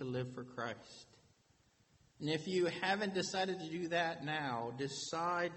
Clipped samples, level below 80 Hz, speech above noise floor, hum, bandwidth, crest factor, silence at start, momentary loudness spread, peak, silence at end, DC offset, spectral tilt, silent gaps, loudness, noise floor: under 0.1%; -78 dBFS; 34 dB; none; 8.4 kHz; 18 dB; 0 s; 10 LU; -20 dBFS; 0 s; under 0.1%; -4.5 dB/octave; none; -39 LUFS; -72 dBFS